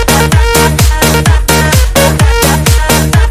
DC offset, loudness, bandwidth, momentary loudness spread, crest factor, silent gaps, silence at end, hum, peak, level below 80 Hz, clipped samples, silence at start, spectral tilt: 0.6%; -8 LUFS; 16.5 kHz; 1 LU; 8 dB; none; 0 s; none; 0 dBFS; -12 dBFS; 1%; 0 s; -4 dB/octave